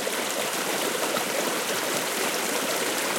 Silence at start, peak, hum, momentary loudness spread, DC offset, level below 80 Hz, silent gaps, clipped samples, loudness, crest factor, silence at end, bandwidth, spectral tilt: 0 s; -12 dBFS; none; 1 LU; under 0.1%; -82 dBFS; none; under 0.1%; -25 LUFS; 16 dB; 0 s; 17 kHz; -1 dB/octave